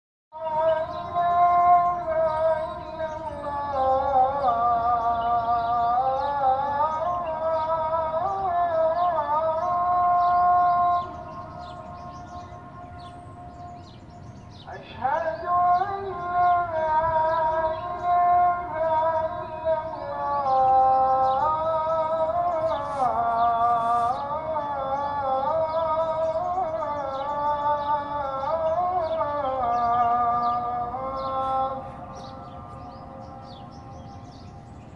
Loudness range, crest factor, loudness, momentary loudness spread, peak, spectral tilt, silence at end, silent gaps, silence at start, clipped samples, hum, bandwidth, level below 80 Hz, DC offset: 9 LU; 16 dB; -24 LUFS; 20 LU; -8 dBFS; -7 dB/octave; 0 s; none; 0.35 s; under 0.1%; none; 6.8 kHz; -52 dBFS; under 0.1%